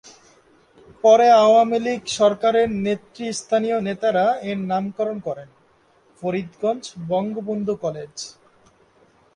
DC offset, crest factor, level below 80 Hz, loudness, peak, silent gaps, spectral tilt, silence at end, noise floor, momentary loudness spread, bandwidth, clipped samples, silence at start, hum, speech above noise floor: under 0.1%; 18 dB; -62 dBFS; -20 LUFS; -4 dBFS; none; -5 dB/octave; 1.05 s; -58 dBFS; 16 LU; 10.5 kHz; under 0.1%; 0.05 s; none; 38 dB